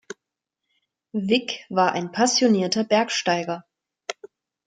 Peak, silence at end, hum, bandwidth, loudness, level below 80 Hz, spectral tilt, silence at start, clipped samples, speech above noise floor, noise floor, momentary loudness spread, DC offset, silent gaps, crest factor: -6 dBFS; 0.4 s; none; 9.4 kHz; -22 LUFS; -72 dBFS; -3.5 dB/octave; 1.15 s; under 0.1%; 63 dB; -84 dBFS; 18 LU; under 0.1%; none; 18 dB